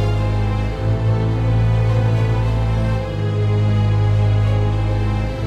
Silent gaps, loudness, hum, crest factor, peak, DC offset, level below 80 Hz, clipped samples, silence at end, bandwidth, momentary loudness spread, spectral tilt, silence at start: none; -18 LUFS; none; 10 dB; -6 dBFS; under 0.1%; -26 dBFS; under 0.1%; 0 s; 6.6 kHz; 4 LU; -8 dB/octave; 0 s